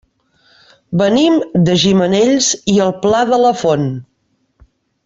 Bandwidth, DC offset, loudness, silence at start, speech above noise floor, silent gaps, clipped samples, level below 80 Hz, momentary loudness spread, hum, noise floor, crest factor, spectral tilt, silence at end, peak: 8 kHz; under 0.1%; -13 LUFS; 0.9 s; 50 dB; none; under 0.1%; -50 dBFS; 6 LU; none; -62 dBFS; 14 dB; -5 dB/octave; 1.05 s; 0 dBFS